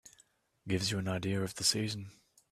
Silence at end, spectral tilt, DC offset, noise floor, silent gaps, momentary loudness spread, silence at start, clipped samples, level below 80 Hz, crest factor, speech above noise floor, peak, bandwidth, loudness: 0.4 s; -3.5 dB/octave; under 0.1%; -69 dBFS; none; 16 LU; 0.05 s; under 0.1%; -66 dBFS; 22 dB; 35 dB; -14 dBFS; 14.5 kHz; -33 LUFS